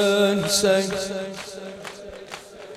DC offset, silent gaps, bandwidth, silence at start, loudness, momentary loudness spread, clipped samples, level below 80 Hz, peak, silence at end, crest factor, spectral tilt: under 0.1%; none; 16 kHz; 0 s; -21 LUFS; 19 LU; under 0.1%; -56 dBFS; -6 dBFS; 0 s; 18 dB; -3.5 dB/octave